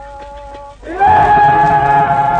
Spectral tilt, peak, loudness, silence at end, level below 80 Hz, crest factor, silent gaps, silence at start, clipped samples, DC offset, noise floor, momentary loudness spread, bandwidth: -6.5 dB/octave; 0 dBFS; -10 LUFS; 0 s; -34 dBFS; 12 dB; none; 0 s; under 0.1%; under 0.1%; -31 dBFS; 23 LU; 8.8 kHz